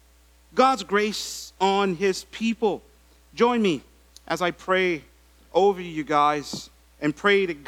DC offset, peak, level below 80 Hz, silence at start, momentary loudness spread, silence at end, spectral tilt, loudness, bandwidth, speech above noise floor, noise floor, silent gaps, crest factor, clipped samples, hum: under 0.1%; -6 dBFS; -56 dBFS; 0.55 s; 11 LU; 0.05 s; -4.5 dB/octave; -24 LUFS; 16 kHz; 33 dB; -56 dBFS; none; 20 dB; under 0.1%; none